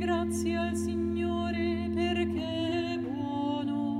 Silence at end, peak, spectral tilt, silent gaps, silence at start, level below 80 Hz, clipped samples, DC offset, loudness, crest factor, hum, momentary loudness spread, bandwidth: 0 s; -18 dBFS; -6 dB/octave; none; 0 s; -50 dBFS; under 0.1%; under 0.1%; -31 LUFS; 12 dB; none; 2 LU; 14 kHz